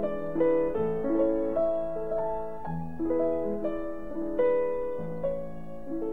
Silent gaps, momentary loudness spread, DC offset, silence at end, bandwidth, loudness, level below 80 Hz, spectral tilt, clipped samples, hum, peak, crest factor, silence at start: none; 10 LU; 1%; 0 s; 3.8 kHz; -30 LUFS; -50 dBFS; -10 dB/octave; under 0.1%; none; -14 dBFS; 16 dB; 0 s